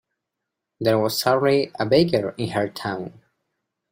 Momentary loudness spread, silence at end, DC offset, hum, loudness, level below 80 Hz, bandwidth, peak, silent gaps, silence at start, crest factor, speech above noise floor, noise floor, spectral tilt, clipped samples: 11 LU; 0.85 s; under 0.1%; none; -21 LUFS; -60 dBFS; 16.5 kHz; -4 dBFS; none; 0.8 s; 18 dB; 62 dB; -82 dBFS; -5.5 dB/octave; under 0.1%